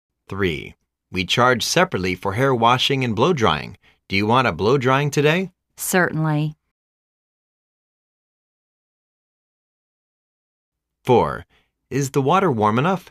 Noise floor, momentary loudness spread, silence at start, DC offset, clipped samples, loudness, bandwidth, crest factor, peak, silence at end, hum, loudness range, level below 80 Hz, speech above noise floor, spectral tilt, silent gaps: under -90 dBFS; 12 LU; 0.3 s; under 0.1%; under 0.1%; -19 LUFS; 15.5 kHz; 18 dB; -2 dBFS; 0.1 s; none; 8 LU; -52 dBFS; over 71 dB; -5 dB/octave; 6.71-10.72 s